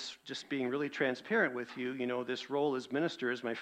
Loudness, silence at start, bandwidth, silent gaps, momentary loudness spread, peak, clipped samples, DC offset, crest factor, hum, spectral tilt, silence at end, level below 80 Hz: -35 LUFS; 0 s; 10 kHz; none; 7 LU; -16 dBFS; under 0.1%; under 0.1%; 18 dB; none; -5 dB/octave; 0 s; -82 dBFS